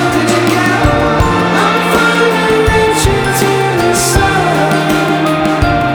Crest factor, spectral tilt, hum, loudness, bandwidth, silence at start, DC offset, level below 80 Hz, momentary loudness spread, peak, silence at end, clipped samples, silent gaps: 10 dB; -4.5 dB/octave; none; -11 LUFS; over 20 kHz; 0 s; under 0.1%; -24 dBFS; 2 LU; 0 dBFS; 0 s; under 0.1%; none